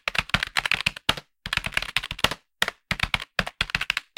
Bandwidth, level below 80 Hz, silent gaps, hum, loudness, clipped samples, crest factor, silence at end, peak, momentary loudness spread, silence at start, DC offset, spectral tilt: 17 kHz; -44 dBFS; none; none; -26 LUFS; under 0.1%; 26 dB; 0.15 s; -2 dBFS; 4 LU; 0.05 s; under 0.1%; -2 dB/octave